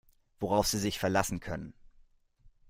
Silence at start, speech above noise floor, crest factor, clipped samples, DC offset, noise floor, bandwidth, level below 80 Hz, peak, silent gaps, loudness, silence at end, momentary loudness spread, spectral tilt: 0.4 s; 31 dB; 22 dB; under 0.1%; under 0.1%; -62 dBFS; 16 kHz; -52 dBFS; -12 dBFS; none; -31 LUFS; 0.2 s; 13 LU; -4 dB/octave